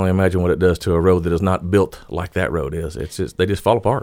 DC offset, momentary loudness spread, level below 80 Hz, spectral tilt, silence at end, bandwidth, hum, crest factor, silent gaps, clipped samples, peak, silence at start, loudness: under 0.1%; 9 LU; -36 dBFS; -7 dB/octave; 0 s; 16 kHz; none; 16 dB; none; under 0.1%; -2 dBFS; 0 s; -19 LUFS